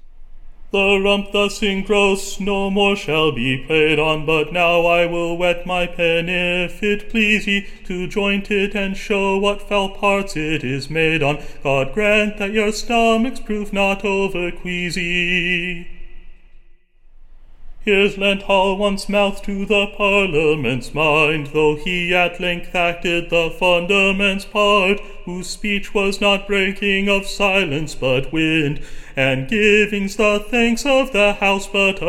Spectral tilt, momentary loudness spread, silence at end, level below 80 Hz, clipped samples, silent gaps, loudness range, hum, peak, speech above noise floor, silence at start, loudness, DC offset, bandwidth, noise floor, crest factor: -4.5 dB/octave; 7 LU; 0 s; -34 dBFS; under 0.1%; none; 3 LU; none; -2 dBFS; 27 dB; 0.05 s; -17 LUFS; under 0.1%; 16 kHz; -45 dBFS; 16 dB